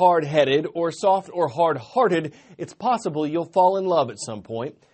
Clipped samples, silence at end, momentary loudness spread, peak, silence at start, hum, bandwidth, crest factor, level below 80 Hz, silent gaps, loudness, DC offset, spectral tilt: under 0.1%; 0.2 s; 12 LU; -4 dBFS; 0 s; none; 8.8 kHz; 18 dB; -66 dBFS; none; -22 LUFS; under 0.1%; -5.5 dB/octave